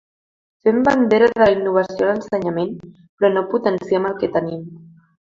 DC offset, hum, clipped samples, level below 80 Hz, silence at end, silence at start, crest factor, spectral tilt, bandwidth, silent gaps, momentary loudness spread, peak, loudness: under 0.1%; none; under 0.1%; -54 dBFS; 0.4 s; 0.65 s; 18 dB; -7 dB/octave; 7.6 kHz; 3.09-3.18 s; 12 LU; -2 dBFS; -18 LUFS